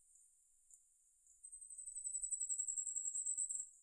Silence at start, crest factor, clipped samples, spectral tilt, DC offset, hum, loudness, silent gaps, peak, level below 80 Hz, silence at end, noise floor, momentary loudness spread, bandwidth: 0.1 s; 16 dB; under 0.1%; 3 dB/octave; under 0.1%; none; -41 LUFS; none; -30 dBFS; -80 dBFS; 0 s; -73 dBFS; 14 LU; 11 kHz